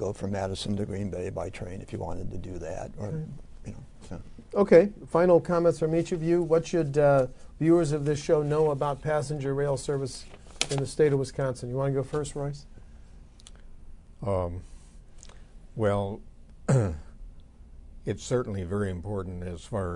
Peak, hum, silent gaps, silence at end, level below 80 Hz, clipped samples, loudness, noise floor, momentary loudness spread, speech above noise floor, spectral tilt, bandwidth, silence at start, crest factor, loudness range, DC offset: -4 dBFS; none; none; 0 s; -46 dBFS; under 0.1%; -27 LUFS; -48 dBFS; 18 LU; 22 dB; -6.5 dB/octave; 11 kHz; 0 s; 24 dB; 12 LU; under 0.1%